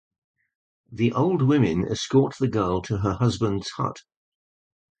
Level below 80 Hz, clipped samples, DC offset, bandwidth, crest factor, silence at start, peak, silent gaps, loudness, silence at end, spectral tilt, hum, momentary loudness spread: -48 dBFS; under 0.1%; under 0.1%; 9 kHz; 18 dB; 0.9 s; -8 dBFS; none; -23 LUFS; 1 s; -7 dB/octave; none; 9 LU